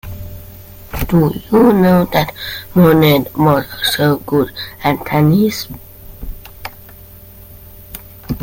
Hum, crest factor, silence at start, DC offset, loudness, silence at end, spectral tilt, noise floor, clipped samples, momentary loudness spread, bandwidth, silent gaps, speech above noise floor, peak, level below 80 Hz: none; 16 dB; 0.05 s; under 0.1%; -13 LUFS; 0 s; -6.5 dB/octave; -37 dBFS; under 0.1%; 22 LU; 17 kHz; none; 24 dB; 0 dBFS; -36 dBFS